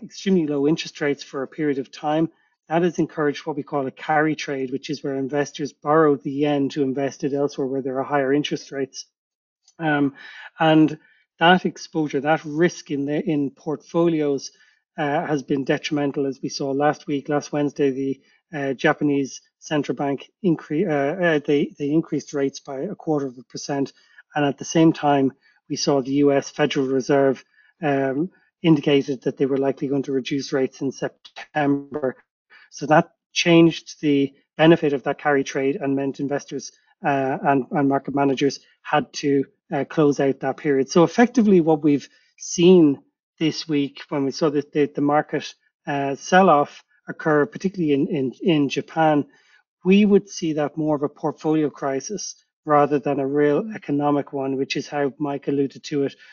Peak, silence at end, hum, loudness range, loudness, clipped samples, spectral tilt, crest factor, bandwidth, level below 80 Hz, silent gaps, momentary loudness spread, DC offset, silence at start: -2 dBFS; 0.2 s; none; 5 LU; -22 LUFS; under 0.1%; -5 dB/octave; 20 dB; 7.2 kHz; -68 dBFS; 9.18-9.56 s, 32.30-32.45 s, 33.26-33.30 s, 43.23-43.33 s, 45.74-45.80 s, 49.68-49.77 s, 52.53-52.63 s; 11 LU; under 0.1%; 0 s